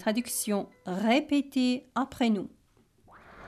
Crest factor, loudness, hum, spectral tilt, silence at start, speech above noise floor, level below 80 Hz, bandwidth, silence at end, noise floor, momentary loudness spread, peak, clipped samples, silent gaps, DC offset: 16 dB; -29 LUFS; none; -4 dB/octave; 0 s; 36 dB; -64 dBFS; 15.5 kHz; 0 s; -64 dBFS; 7 LU; -14 dBFS; under 0.1%; none; under 0.1%